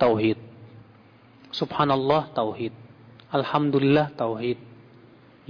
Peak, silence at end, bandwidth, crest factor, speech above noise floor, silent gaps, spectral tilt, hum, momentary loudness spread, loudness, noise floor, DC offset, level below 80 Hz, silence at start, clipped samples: -10 dBFS; 0.75 s; 5.4 kHz; 16 dB; 30 dB; none; -8 dB/octave; none; 13 LU; -25 LUFS; -53 dBFS; under 0.1%; -60 dBFS; 0 s; under 0.1%